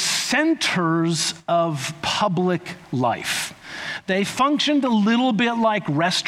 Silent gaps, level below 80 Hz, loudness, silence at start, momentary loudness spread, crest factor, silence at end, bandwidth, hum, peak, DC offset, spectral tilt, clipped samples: none; -62 dBFS; -21 LUFS; 0 s; 7 LU; 14 dB; 0 s; 16 kHz; none; -8 dBFS; under 0.1%; -4 dB/octave; under 0.1%